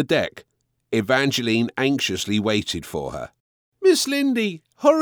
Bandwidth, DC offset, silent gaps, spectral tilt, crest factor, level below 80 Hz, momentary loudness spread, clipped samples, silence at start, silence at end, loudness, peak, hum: over 20 kHz; under 0.1%; 3.40-3.72 s; -4 dB/octave; 18 dB; -54 dBFS; 11 LU; under 0.1%; 0 s; 0 s; -22 LUFS; -4 dBFS; none